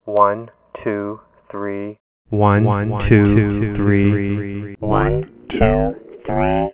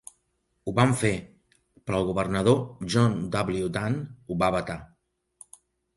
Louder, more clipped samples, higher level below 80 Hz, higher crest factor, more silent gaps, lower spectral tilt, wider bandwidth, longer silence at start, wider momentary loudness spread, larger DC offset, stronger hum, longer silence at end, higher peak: first, -18 LUFS vs -26 LUFS; neither; first, -32 dBFS vs -52 dBFS; about the same, 18 dB vs 20 dB; first, 2.00-2.25 s vs none; first, -12 dB/octave vs -6 dB/octave; second, 4 kHz vs 11.5 kHz; second, 0.05 s vs 0.65 s; about the same, 14 LU vs 12 LU; neither; neither; second, 0 s vs 1.1 s; first, 0 dBFS vs -8 dBFS